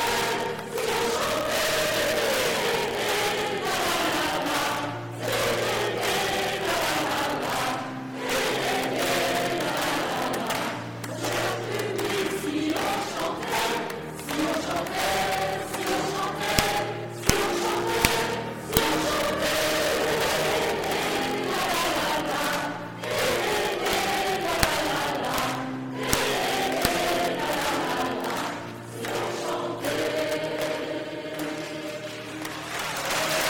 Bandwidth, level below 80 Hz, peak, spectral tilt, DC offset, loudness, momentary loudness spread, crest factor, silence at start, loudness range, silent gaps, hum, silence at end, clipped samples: 18 kHz; -48 dBFS; 0 dBFS; -3 dB/octave; under 0.1%; -26 LUFS; 8 LU; 26 dB; 0 s; 4 LU; none; none; 0 s; under 0.1%